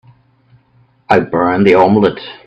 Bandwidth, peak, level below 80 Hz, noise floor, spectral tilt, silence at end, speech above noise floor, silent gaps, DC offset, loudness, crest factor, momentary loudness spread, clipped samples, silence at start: 7.8 kHz; 0 dBFS; -50 dBFS; -52 dBFS; -8 dB/octave; 0.15 s; 41 dB; none; under 0.1%; -11 LUFS; 14 dB; 5 LU; under 0.1%; 1.1 s